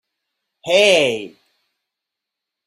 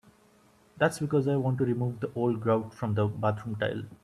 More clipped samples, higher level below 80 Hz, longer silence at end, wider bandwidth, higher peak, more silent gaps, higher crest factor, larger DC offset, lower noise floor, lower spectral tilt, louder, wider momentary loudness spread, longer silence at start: neither; about the same, -66 dBFS vs -64 dBFS; first, 1.4 s vs 0.1 s; first, 15.5 kHz vs 13 kHz; first, -2 dBFS vs -10 dBFS; neither; about the same, 20 dB vs 18 dB; neither; first, -83 dBFS vs -61 dBFS; second, -2.5 dB/octave vs -7.5 dB/octave; first, -14 LUFS vs -29 LUFS; first, 22 LU vs 6 LU; second, 0.65 s vs 0.8 s